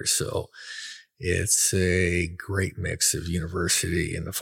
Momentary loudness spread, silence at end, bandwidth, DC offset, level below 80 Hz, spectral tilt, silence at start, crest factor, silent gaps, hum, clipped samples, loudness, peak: 16 LU; 0 s; 17 kHz; under 0.1%; -44 dBFS; -3 dB/octave; 0 s; 16 dB; none; none; under 0.1%; -24 LUFS; -10 dBFS